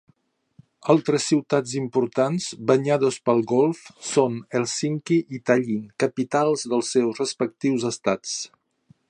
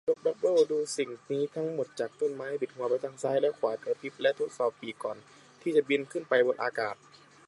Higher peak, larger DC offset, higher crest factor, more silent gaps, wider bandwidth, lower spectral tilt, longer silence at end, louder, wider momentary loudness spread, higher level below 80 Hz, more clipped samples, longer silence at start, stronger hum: first, -4 dBFS vs -12 dBFS; neither; about the same, 20 dB vs 18 dB; neither; about the same, 11 kHz vs 11.5 kHz; about the same, -5 dB/octave vs -4.5 dB/octave; about the same, 0.65 s vs 0.55 s; first, -23 LUFS vs -30 LUFS; second, 6 LU vs 10 LU; first, -70 dBFS vs -82 dBFS; neither; first, 0.85 s vs 0.05 s; neither